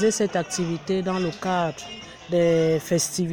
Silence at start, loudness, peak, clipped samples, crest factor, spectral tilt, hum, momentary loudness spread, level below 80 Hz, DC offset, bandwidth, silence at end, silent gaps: 0 s; -24 LUFS; -10 dBFS; under 0.1%; 14 dB; -4.5 dB/octave; none; 9 LU; -54 dBFS; under 0.1%; 17 kHz; 0 s; none